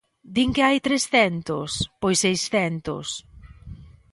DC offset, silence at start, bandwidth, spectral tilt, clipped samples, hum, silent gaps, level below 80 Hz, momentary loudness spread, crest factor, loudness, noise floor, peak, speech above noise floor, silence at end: under 0.1%; 0.25 s; 11.5 kHz; -3.5 dB/octave; under 0.1%; none; none; -48 dBFS; 10 LU; 18 dB; -22 LUFS; -42 dBFS; -6 dBFS; 20 dB; 0.25 s